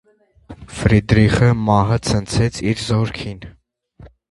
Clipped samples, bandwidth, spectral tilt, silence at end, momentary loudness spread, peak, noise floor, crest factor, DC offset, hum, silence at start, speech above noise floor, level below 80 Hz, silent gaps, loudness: under 0.1%; 11.5 kHz; -6.5 dB/octave; 0.25 s; 15 LU; 0 dBFS; -49 dBFS; 18 dB; under 0.1%; none; 0.5 s; 33 dB; -34 dBFS; none; -17 LUFS